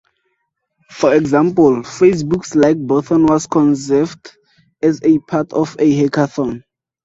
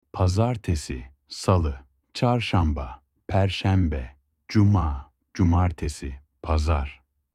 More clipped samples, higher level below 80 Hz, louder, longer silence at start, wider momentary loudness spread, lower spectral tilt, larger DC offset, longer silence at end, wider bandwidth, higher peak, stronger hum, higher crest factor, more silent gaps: neither; second, -52 dBFS vs -34 dBFS; first, -15 LUFS vs -24 LUFS; first, 0.9 s vs 0.15 s; second, 6 LU vs 17 LU; about the same, -6.5 dB/octave vs -7 dB/octave; neither; about the same, 0.45 s vs 0.4 s; second, 8 kHz vs 11.5 kHz; first, 0 dBFS vs -6 dBFS; neither; about the same, 14 dB vs 18 dB; neither